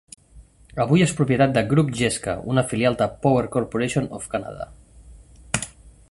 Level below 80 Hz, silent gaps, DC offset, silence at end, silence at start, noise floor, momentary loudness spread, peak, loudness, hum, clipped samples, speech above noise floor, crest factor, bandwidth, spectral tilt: -48 dBFS; none; under 0.1%; 0.2 s; 0.35 s; -49 dBFS; 13 LU; -2 dBFS; -22 LUFS; none; under 0.1%; 28 dB; 20 dB; 11.5 kHz; -5.5 dB/octave